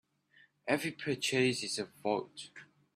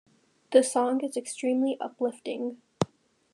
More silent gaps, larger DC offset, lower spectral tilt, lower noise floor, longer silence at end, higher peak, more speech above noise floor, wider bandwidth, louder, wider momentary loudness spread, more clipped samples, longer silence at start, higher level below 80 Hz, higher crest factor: neither; neither; second, -3.5 dB/octave vs -5 dB/octave; first, -67 dBFS vs -51 dBFS; second, 0.3 s vs 0.5 s; second, -14 dBFS vs -6 dBFS; first, 32 dB vs 24 dB; first, 15.5 kHz vs 12.5 kHz; second, -34 LUFS vs -28 LUFS; first, 18 LU vs 11 LU; neither; first, 0.65 s vs 0.5 s; about the same, -76 dBFS vs -78 dBFS; about the same, 22 dB vs 22 dB